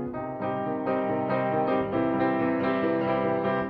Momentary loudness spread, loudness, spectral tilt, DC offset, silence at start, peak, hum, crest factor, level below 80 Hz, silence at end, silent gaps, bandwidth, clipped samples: 5 LU; -27 LUFS; -10 dB/octave; under 0.1%; 0 s; -14 dBFS; none; 14 dB; -58 dBFS; 0 s; none; 5.4 kHz; under 0.1%